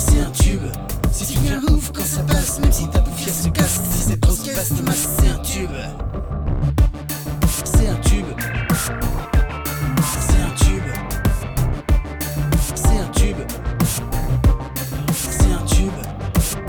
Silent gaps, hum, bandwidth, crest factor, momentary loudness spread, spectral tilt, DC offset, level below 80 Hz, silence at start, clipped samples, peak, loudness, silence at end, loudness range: none; none; over 20 kHz; 16 dB; 7 LU; -5 dB/octave; under 0.1%; -20 dBFS; 0 s; under 0.1%; -2 dBFS; -20 LUFS; 0 s; 2 LU